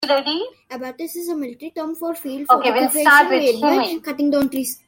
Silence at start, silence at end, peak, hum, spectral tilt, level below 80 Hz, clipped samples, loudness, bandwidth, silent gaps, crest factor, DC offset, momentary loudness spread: 0 s; 0.1 s; -2 dBFS; none; -2 dB/octave; -64 dBFS; under 0.1%; -18 LUFS; 17 kHz; none; 18 dB; under 0.1%; 17 LU